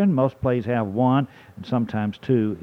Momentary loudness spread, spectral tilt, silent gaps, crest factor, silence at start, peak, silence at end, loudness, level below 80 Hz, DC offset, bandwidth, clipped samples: 7 LU; -9.5 dB/octave; none; 14 dB; 0 s; -8 dBFS; 0 s; -23 LUFS; -54 dBFS; under 0.1%; 6.2 kHz; under 0.1%